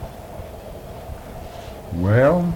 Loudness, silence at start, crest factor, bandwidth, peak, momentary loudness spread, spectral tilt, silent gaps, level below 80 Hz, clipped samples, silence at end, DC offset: -18 LUFS; 0 s; 16 dB; 18 kHz; -6 dBFS; 20 LU; -8 dB/octave; none; -40 dBFS; under 0.1%; 0 s; under 0.1%